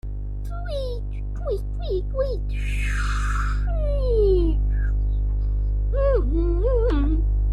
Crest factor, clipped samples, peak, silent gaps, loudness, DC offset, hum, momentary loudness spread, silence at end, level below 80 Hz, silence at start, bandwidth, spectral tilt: 12 dB; under 0.1%; -10 dBFS; none; -25 LUFS; under 0.1%; 50 Hz at -20 dBFS; 9 LU; 0 s; -22 dBFS; 0.05 s; 8.6 kHz; -7.5 dB/octave